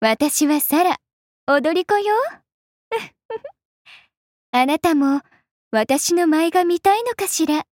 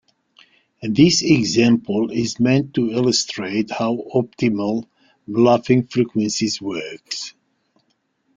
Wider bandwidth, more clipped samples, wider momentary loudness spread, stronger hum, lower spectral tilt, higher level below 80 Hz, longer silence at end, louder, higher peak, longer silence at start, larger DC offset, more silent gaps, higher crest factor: first, 17 kHz vs 9.4 kHz; neither; about the same, 11 LU vs 13 LU; neither; second, -2.5 dB/octave vs -5 dB/octave; second, -62 dBFS vs -56 dBFS; second, 0.1 s vs 1.05 s; about the same, -19 LUFS vs -19 LUFS; second, -6 dBFS vs -2 dBFS; second, 0 s vs 0.8 s; neither; first, 1.13-1.47 s, 2.54-2.91 s, 3.25-3.29 s, 3.65-3.85 s, 4.17-4.53 s, 5.51-5.71 s vs none; about the same, 14 dB vs 18 dB